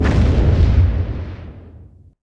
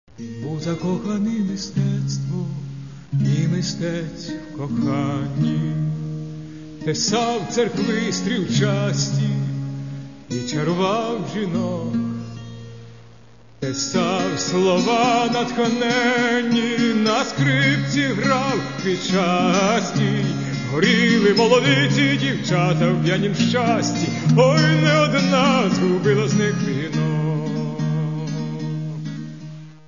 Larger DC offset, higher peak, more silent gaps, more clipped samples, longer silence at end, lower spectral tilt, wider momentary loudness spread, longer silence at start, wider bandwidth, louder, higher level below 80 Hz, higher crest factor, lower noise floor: second, under 0.1% vs 0.4%; about the same, -2 dBFS vs -2 dBFS; neither; neither; first, 0.45 s vs 0.1 s; first, -8.5 dB/octave vs -5.5 dB/octave; first, 19 LU vs 14 LU; second, 0 s vs 0.2 s; about the same, 7.2 kHz vs 7.4 kHz; first, -16 LUFS vs -20 LUFS; first, -20 dBFS vs -54 dBFS; about the same, 14 dB vs 18 dB; second, -42 dBFS vs -48 dBFS